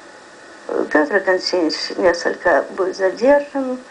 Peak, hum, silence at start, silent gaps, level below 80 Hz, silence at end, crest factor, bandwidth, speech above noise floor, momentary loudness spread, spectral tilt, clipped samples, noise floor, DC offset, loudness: -2 dBFS; none; 0 s; none; -54 dBFS; 0 s; 18 dB; 10 kHz; 23 dB; 9 LU; -3.5 dB/octave; under 0.1%; -41 dBFS; under 0.1%; -18 LUFS